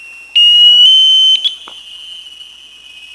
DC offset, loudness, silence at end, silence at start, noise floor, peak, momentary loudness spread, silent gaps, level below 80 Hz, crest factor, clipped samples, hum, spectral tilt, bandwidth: under 0.1%; -5 LUFS; 0.95 s; 0.35 s; -36 dBFS; 0 dBFS; 18 LU; none; -60 dBFS; 10 dB; under 0.1%; none; 4 dB/octave; 11 kHz